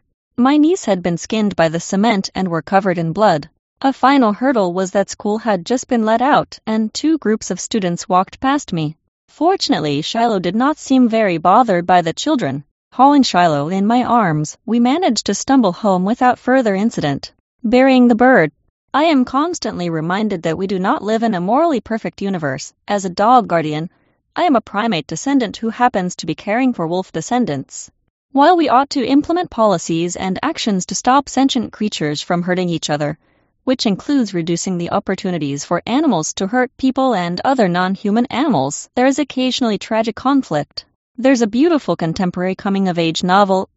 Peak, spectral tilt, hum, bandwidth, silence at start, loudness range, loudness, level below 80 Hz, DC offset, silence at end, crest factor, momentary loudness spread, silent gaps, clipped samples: 0 dBFS; -4.5 dB/octave; none; 8 kHz; 0.4 s; 4 LU; -16 LUFS; -52 dBFS; under 0.1%; 0.1 s; 16 dB; 9 LU; 3.59-3.76 s, 9.08-9.28 s, 12.71-12.91 s, 17.40-17.59 s, 18.70-18.88 s, 28.10-28.29 s, 40.95-41.15 s; under 0.1%